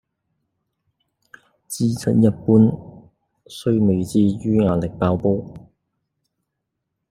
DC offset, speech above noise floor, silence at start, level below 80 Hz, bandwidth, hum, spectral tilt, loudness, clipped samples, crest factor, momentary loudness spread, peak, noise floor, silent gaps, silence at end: under 0.1%; 60 dB; 1.7 s; -52 dBFS; 15 kHz; none; -8 dB/octave; -19 LUFS; under 0.1%; 18 dB; 14 LU; -2 dBFS; -78 dBFS; none; 1.5 s